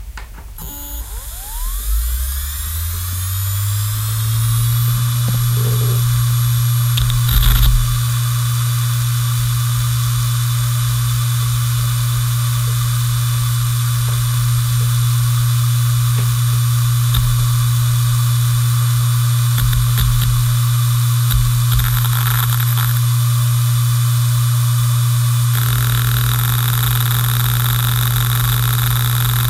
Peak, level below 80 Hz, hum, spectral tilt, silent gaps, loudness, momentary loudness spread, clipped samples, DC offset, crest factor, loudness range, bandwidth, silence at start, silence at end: 0 dBFS; -26 dBFS; none; -4 dB/octave; none; -16 LUFS; 5 LU; under 0.1%; under 0.1%; 14 dB; 2 LU; 16.5 kHz; 0 s; 0 s